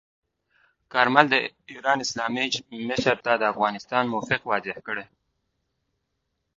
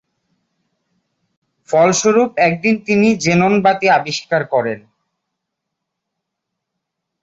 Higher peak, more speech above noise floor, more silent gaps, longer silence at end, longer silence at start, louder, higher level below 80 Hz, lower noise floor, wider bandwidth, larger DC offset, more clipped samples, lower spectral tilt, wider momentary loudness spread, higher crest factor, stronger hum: about the same, 0 dBFS vs -2 dBFS; second, 53 dB vs 64 dB; neither; second, 1.55 s vs 2.45 s; second, 0.95 s vs 1.7 s; second, -24 LUFS vs -14 LUFS; second, -64 dBFS vs -56 dBFS; about the same, -78 dBFS vs -78 dBFS; about the same, 7.8 kHz vs 8 kHz; neither; neither; about the same, -3.5 dB/octave vs -4.5 dB/octave; first, 12 LU vs 6 LU; first, 26 dB vs 16 dB; neither